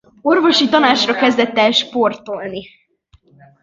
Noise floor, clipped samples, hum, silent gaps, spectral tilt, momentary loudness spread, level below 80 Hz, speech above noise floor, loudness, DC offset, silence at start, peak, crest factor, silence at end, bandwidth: -54 dBFS; under 0.1%; none; none; -3.5 dB/octave; 14 LU; -60 dBFS; 39 dB; -14 LUFS; under 0.1%; 0.25 s; 0 dBFS; 16 dB; 1 s; 7.8 kHz